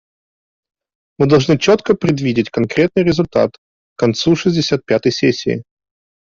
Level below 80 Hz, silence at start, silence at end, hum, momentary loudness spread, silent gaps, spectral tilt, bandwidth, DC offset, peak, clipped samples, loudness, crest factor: -48 dBFS; 1.2 s; 0.65 s; none; 6 LU; 3.58-3.96 s; -6 dB/octave; 7.6 kHz; under 0.1%; -2 dBFS; under 0.1%; -15 LUFS; 14 dB